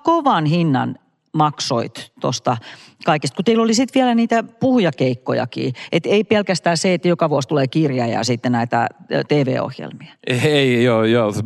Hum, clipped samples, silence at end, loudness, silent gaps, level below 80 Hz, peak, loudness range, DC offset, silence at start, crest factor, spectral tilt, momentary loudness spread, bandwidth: none; under 0.1%; 0 s; -18 LUFS; none; -68 dBFS; -4 dBFS; 2 LU; under 0.1%; 0.05 s; 14 dB; -5.5 dB/octave; 9 LU; 12.5 kHz